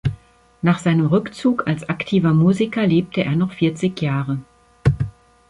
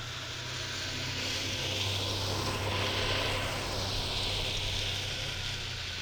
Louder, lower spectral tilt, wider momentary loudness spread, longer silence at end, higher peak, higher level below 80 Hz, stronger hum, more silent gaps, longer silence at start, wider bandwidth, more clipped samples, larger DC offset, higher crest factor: first, -19 LUFS vs -32 LUFS; first, -7.5 dB/octave vs -3 dB/octave; first, 8 LU vs 5 LU; first, 0.4 s vs 0 s; first, -4 dBFS vs -18 dBFS; about the same, -42 dBFS vs -46 dBFS; neither; neither; about the same, 0.05 s vs 0 s; second, 11 kHz vs over 20 kHz; neither; neither; about the same, 16 dB vs 16 dB